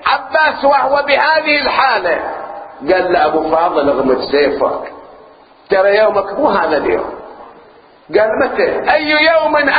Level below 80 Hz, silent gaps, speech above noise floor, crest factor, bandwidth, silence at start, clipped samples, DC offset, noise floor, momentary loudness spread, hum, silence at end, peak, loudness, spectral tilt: -46 dBFS; none; 31 dB; 14 dB; 5 kHz; 0 s; under 0.1%; under 0.1%; -43 dBFS; 9 LU; none; 0 s; 0 dBFS; -13 LUFS; -7.5 dB/octave